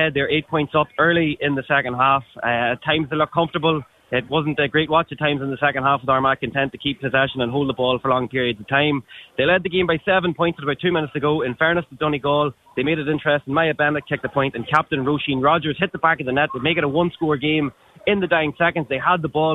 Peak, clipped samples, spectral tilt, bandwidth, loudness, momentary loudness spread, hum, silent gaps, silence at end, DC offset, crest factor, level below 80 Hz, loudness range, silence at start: -2 dBFS; under 0.1%; -7.5 dB/octave; 6.8 kHz; -20 LUFS; 4 LU; none; none; 0 s; under 0.1%; 18 dB; -52 dBFS; 1 LU; 0 s